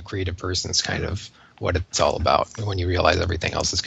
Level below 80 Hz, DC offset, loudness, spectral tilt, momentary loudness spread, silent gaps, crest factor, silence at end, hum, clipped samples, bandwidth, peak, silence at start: -38 dBFS; under 0.1%; -23 LUFS; -3.5 dB/octave; 10 LU; none; 22 dB; 0 s; none; under 0.1%; 8.2 kHz; 0 dBFS; 0 s